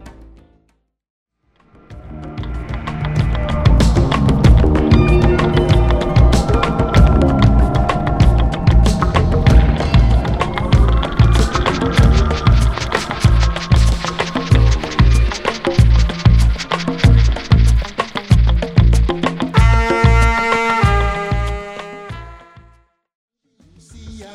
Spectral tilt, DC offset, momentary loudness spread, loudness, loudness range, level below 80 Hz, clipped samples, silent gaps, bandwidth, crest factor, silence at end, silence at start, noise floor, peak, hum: -6.5 dB/octave; under 0.1%; 9 LU; -14 LUFS; 6 LU; -16 dBFS; under 0.1%; 1.10-1.26 s, 23.15-23.28 s; 11 kHz; 14 dB; 0.05 s; 0 s; -62 dBFS; 0 dBFS; none